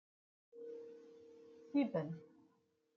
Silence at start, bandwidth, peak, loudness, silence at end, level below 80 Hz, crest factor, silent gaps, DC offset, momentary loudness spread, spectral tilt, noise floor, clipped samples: 0.55 s; 6.2 kHz; -24 dBFS; -42 LUFS; 0.7 s; -88 dBFS; 22 dB; none; under 0.1%; 23 LU; -7.5 dB/octave; -78 dBFS; under 0.1%